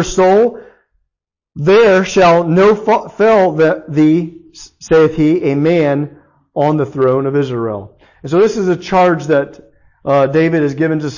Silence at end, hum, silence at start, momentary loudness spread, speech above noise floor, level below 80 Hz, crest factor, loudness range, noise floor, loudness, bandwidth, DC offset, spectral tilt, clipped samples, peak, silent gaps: 0 s; none; 0 s; 10 LU; 67 dB; -44 dBFS; 10 dB; 4 LU; -79 dBFS; -12 LUFS; 7.4 kHz; under 0.1%; -6.5 dB/octave; under 0.1%; -2 dBFS; none